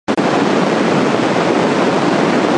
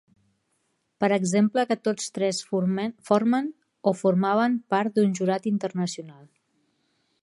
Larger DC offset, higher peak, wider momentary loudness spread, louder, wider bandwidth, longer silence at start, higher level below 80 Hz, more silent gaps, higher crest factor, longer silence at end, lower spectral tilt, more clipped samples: neither; first, 0 dBFS vs -6 dBFS; second, 1 LU vs 7 LU; first, -14 LUFS vs -25 LUFS; about the same, 11 kHz vs 11.5 kHz; second, 0.1 s vs 1 s; first, -54 dBFS vs -74 dBFS; neither; second, 14 dB vs 20 dB; second, 0 s vs 1.1 s; about the same, -5.5 dB/octave vs -5.5 dB/octave; neither